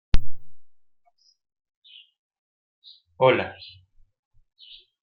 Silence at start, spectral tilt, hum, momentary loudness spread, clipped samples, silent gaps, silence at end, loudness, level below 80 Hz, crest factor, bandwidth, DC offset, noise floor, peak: 0.15 s; -7 dB/octave; none; 29 LU; under 0.1%; 1.76-1.82 s, 2.19-2.30 s, 2.38-2.82 s; 1.5 s; -23 LUFS; -36 dBFS; 20 dB; 6 kHz; under 0.1%; -64 dBFS; -4 dBFS